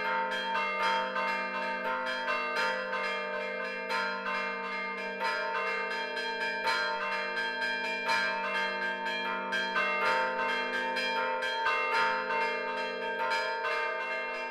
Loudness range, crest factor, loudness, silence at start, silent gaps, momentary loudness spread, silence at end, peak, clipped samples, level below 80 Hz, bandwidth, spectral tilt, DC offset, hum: 3 LU; 16 dB; -31 LUFS; 0 s; none; 5 LU; 0 s; -16 dBFS; under 0.1%; -74 dBFS; 14.5 kHz; -2.5 dB/octave; under 0.1%; none